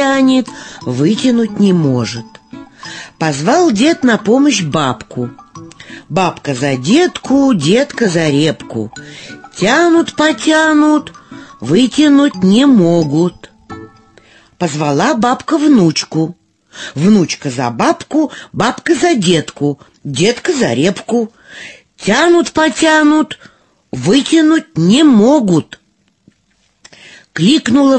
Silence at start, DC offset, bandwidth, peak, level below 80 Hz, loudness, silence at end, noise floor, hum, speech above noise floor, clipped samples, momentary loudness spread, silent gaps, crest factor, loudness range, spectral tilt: 0 s; under 0.1%; 8.8 kHz; 0 dBFS; -50 dBFS; -12 LUFS; 0 s; -58 dBFS; none; 46 dB; under 0.1%; 17 LU; none; 12 dB; 4 LU; -5 dB/octave